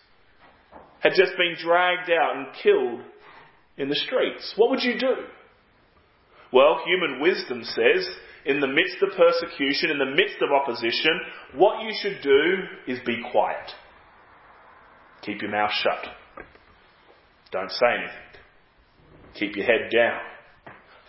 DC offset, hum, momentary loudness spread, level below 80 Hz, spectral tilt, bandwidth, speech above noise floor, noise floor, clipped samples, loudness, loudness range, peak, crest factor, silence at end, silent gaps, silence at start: under 0.1%; none; 13 LU; -64 dBFS; -7.5 dB/octave; 5.8 kHz; 36 dB; -59 dBFS; under 0.1%; -23 LUFS; 8 LU; 0 dBFS; 24 dB; 0.35 s; none; 0.75 s